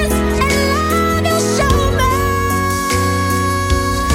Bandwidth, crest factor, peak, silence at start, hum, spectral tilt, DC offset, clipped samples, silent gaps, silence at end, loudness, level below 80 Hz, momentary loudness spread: 17 kHz; 14 dB; -2 dBFS; 0 s; none; -4.5 dB/octave; under 0.1%; under 0.1%; none; 0 s; -15 LUFS; -24 dBFS; 2 LU